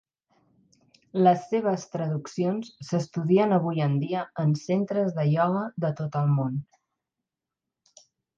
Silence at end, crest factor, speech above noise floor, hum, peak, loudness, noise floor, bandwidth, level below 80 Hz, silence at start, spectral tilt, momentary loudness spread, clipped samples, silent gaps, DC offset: 1.75 s; 18 dB; 63 dB; none; -8 dBFS; -26 LUFS; -88 dBFS; 7.6 kHz; -70 dBFS; 1.15 s; -8 dB/octave; 9 LU; under 0.1%; none; under 0.1%